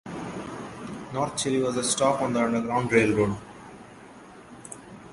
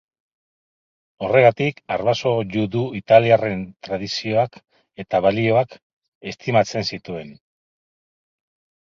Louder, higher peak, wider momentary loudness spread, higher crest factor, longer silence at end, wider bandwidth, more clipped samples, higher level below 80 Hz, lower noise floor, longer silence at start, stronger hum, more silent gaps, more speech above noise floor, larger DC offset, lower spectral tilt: second, -25 LUFS vs -20 LUFS; second, -6 dBFS vs 0 dBFS; first, 24 LU vs 15 LU; about the same, 22 dB vs 22 dB; second, 0 s vs 1.5 s; first, 11.5 kHz vs 7.4 kHz; neither; about the same, -56 dBFS vs -56 dBFS; second, -47 dBFS vs under -90 dBFS; second, 0.05 s vs 1.2 s; neither; second, none vs 5.82-6.02 s, 6.08-6.21 s; second, 23 dB vs over 71 dB; neither; second, -4.5 dB/octave vs -6 dB/octave